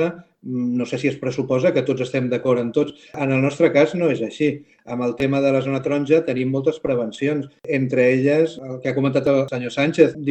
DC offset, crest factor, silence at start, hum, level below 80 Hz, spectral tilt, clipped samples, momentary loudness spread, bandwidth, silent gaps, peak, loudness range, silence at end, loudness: under 0.1%; 20 dB; 0 s; none; -58 dBFS; -7 dB/octave; under 0.1%; 9 LU; 8.6 kHz; none; 0 dBFS; 2 LU; 0 s; -20 LUFS